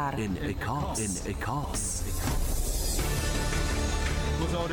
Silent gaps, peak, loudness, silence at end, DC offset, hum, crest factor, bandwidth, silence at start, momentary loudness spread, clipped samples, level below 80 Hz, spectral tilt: none; -18 dBFS; -30 LUFS; 0 s; under 0.1%; none; 12 dB; 18 kHz; 0 s; 3 LU; under 0.1%; -32 dBFS; -4 dB/octave